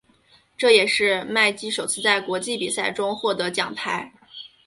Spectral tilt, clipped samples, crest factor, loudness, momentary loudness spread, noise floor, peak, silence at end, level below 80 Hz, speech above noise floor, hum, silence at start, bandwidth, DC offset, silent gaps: -2 dB/octave; under 0.1%; 20 dB; -21 LUFS; 11 LU; -58 dBFS; -2 dBFS; 0.2 s; -66 dBFS; 36 dB; none; 0.6 s; 12 kHz; under 0.1%; none